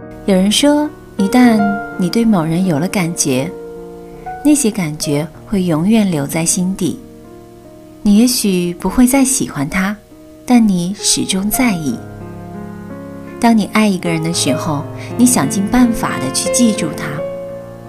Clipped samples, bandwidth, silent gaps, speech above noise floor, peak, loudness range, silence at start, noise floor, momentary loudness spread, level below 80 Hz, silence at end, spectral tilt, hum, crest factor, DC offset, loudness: under 0.1%; 16 kHz; none; 23 dB; 0 dBFS; 3 LU; 0 s; -37 dBFS; 18 LU; -38 dBFS; 0 s; -4.5 dB/octave; none; 14 dB; under 0.1%; -14 LUFS